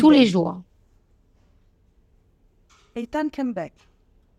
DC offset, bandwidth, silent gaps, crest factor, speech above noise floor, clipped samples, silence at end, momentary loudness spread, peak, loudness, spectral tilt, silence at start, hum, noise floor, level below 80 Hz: under 0.1%; 9 kHz; none; 18 dB; 41 dB; under 0.1%; 0.7 s; 21 LU; -4 dBFS; -22 LUFS; -6.5 dB/octave; 0 s; none; -60 dBFS; -58 dBFS